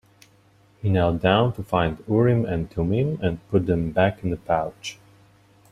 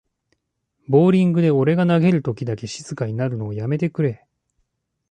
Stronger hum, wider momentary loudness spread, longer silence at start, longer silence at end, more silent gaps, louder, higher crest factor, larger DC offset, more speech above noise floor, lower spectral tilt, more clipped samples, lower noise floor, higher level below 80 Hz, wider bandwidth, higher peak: neither; second, 9 LU vs 12 LU; about the same, 0.85 s vs 0.9 s; second, 0.8 s vs 0.95 s; neither; second, -23 LUFS vs -19 LUFS; about the same, 18 dB vs 16 dB; neither; second, 35 dB vs 55 dB; about the same, -7.5 dB/octave vs -8 dB/octave; neither; second, -57 dBFS vs -73 dBFS; first, -46 dBFS vs -58 dBFS; first, 12 kHz vs 9.2 kHz; about the same, -4 dBFS vs -4 dBFS